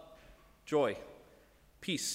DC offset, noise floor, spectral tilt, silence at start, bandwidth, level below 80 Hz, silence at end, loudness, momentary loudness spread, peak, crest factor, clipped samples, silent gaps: under 0.1%; -63 dBFS; -3.5 dB/octave; 0 s; 16 kHz; -66 dBFS; 0 s; -35 LUFS; 23 LU; -20 dBFS; 18 dB; under 0.1%; none